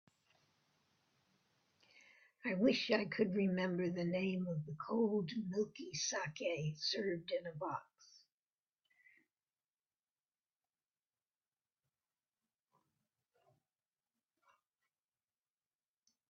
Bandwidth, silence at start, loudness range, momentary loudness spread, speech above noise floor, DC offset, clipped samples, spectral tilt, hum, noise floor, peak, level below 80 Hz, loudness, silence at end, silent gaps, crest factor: 7 kHz; 2.45 s; 9 LU; 8 LU; over 52 dB; under 0.1%; under 0.1%; -4.5 dB/octave; none; under -90 dBFS; -20 dBFS; -82 dBFS; -39 LUFS; 8.15 s; none; 22 dB